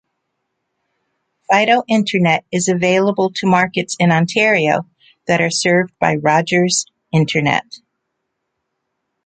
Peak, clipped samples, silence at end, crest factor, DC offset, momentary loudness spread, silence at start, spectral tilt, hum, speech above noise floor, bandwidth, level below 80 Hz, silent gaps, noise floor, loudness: 0 dBFS; under 0.1%; 1.5 s; 16 dB; under 0.1%; 5 LU; 1.5 s; -4.5 dB/octave; none; 59 dB; 9.4 kHz; -58 dBFS; none; -74 dBFS; -15 LUFS